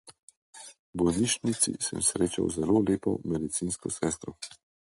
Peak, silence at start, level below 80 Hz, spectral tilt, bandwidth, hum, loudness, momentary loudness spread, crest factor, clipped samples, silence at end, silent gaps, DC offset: -10 dBFS; 0.05 s; -54 dBFS; -4 dB/octave; 11.5 kHz; none; -28 LUFS; 17 LU; 20 dB; under 0.1%; 0.35 s; 0.19-0.28 s, 0.37-0.53 s, 0.79-0.93 s; under 0.1%